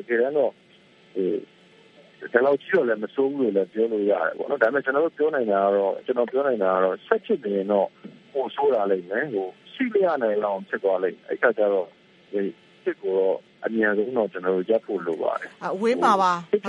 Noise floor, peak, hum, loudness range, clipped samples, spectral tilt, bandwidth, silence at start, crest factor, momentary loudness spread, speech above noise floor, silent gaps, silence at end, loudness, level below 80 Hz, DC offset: -53 dBFS; -4 dBFS; none; 3 LU; under 0.1%; -6.5 dB/octave; 11 kHz; 0 s; 20 dB; 9 LU; 30 dB; none; 0 s; -24 LUFS; -76 dBFS; under 0.1%